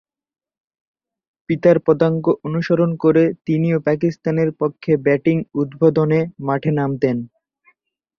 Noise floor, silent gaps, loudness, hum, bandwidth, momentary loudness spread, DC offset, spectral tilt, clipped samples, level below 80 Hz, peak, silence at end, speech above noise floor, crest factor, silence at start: -61 dBFS; none; -18 LUFS; none; 6.6 kHz; 6 LU; under 0.1%; -9.5 dB/octave; under 0.1%; -58 dBFS; -2 dBFS; 0.9 s; 44 dB; 16 dB; 1.5 s